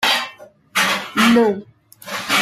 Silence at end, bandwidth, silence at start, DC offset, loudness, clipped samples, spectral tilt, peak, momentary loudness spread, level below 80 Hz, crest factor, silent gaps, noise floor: 0 s; 16 kHz; 0 s; under 0.1%; -17 LUFS; under 0.1%; -3 dB/octave; -2 dBFS; 16 LU; -58 dBFS; 16 dB; none; -40 dBFS